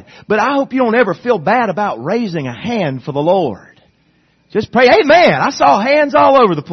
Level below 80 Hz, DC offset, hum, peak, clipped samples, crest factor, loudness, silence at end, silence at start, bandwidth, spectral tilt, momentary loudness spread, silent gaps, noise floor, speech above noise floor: -52 dBFS; under 0.1%; none; 0 dBFS; under 0.1%; 14 dB; -13 LUFS; 0 s; 0.3 s; 6.4 kHz; -6 dB/octave; 11 LU; none; -56 dBFS; 43 dB